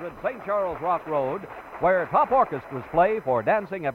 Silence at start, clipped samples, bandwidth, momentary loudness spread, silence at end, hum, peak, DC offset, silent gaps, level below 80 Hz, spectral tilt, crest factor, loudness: 0 s; under 0.1%; 16 kHz; 10 LU; 0 s; none; -8 dBFS; under 0.1%; none; -54 dBFS; -8 dB/octave; 16 dB; -24 LUFS